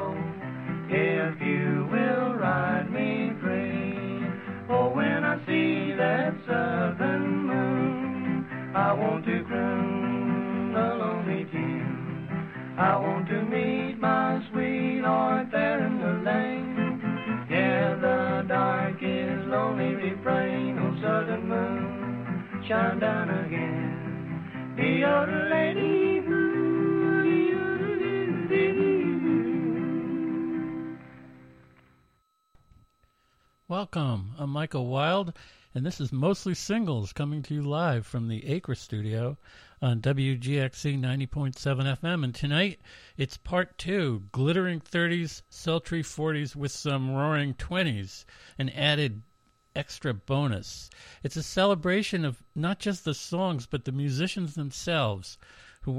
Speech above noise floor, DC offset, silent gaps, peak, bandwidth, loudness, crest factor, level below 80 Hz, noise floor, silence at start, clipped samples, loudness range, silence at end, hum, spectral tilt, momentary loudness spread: 41 dB; under 0.1%; none; -10 dBFS; 13 kHz; -28 LUFS; 18 dB; -56 dBFS; -70 dBFS; 0 s; under 0.1%; 5 LU; 0 s; none; -6.5 dB/octave; 9 LU